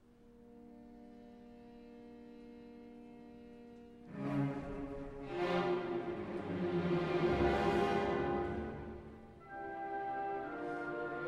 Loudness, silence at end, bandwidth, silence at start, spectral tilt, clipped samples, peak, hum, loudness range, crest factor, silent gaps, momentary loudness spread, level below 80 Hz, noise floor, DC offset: -38 LUFS; 0 s; 9.8 kHz; 0.2 s; -7.5 dB/octave; under 0.1%; -20 dBFS; none; 20 LU; 18 dB; none; 23 LU; -56 dBFS; -61 dBFS; under 0.1%